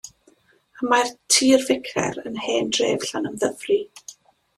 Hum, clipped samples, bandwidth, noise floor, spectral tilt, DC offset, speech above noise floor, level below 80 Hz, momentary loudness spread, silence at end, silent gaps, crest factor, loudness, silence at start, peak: none; under 0.1%; 14 kHz; -59 dBFS; -2.5 dB/octave; under 0.1%; 37 dB; -62 dBFS; 16 LU; 0.45 s; none; 20 dB; -21 LUFS; 0.05 s; -4 dBFS